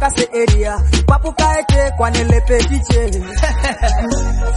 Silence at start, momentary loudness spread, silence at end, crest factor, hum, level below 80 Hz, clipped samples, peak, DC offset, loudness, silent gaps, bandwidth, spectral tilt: 0 s; 5 LU; 0 s; 12 dB; none; -16 dBFS; under 0.1%; 0 dBFS; under 0.1%; -15 LUFS; none; 11.5 kHz; -5 dB/octave